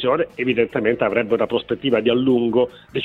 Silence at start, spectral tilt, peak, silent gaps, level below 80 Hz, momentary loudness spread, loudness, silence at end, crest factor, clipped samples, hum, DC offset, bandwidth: 0 s; -8 dB/octave; -4 dBFS; none; -54 dBFS; 4 LU; -20 LUFS; 0 s; 16 dB; under 0.1%; none; under 0.1%; 4.4 kHz